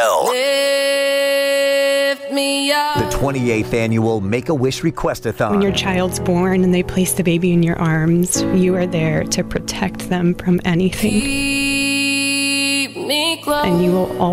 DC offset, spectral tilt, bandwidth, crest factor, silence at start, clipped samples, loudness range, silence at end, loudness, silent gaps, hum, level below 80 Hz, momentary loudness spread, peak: under 0.1%; -4.5 dB/octave; 16.5 kHz; 10 dB; 0 s; under 0.1%; 2 LU; 0 s; -17 LUFS; none; none; -38 dBFS; 4 LU; -6 dBFS